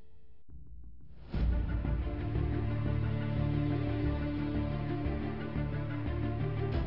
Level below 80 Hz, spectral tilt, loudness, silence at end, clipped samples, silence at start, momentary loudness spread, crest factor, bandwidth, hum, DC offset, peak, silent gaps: -40 dBFS; -11 dB/octave; -35 LUFS; 0 s; under 0.1%; 0.3 s; 5 LU; 14 dB; 5.6 kHz; none; 0.5%; -20 dBFS; none